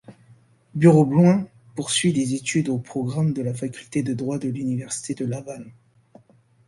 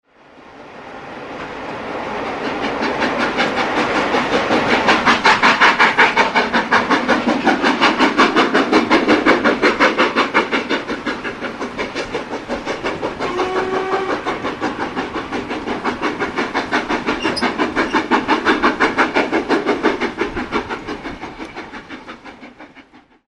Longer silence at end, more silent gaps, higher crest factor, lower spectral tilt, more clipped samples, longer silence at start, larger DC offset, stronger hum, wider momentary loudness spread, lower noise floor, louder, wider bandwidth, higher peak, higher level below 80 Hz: first, 0.95 s vs 0.5 s; neither; about the same, 20 dB vs 18 dB; first, -6 dB/octave vs -4 dB/octave; neither; second, 0.1 s vs 0.35 s; neither; neither; about the same, 16 LU vs 16 LU; first, -57 dBFS vs -45 dBFS; second, -22 LUFS vs -16 LUFS; about the same, 11.5 kHz vs 11.5 kHz; about the same, -2 dBFS vs 0 dBFS; second, -60 dBFS vs -46 dBFS